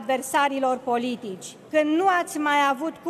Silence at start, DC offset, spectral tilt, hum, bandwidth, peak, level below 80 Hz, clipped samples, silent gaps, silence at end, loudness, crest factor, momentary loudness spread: 0 s; under 0.1%; -3 dB/octave; none; 13.5 kHz; -8 dBFS; -76 dBFS; under 0.1%; none; 0 s; -23 LUFS; 14 dB; 11 LU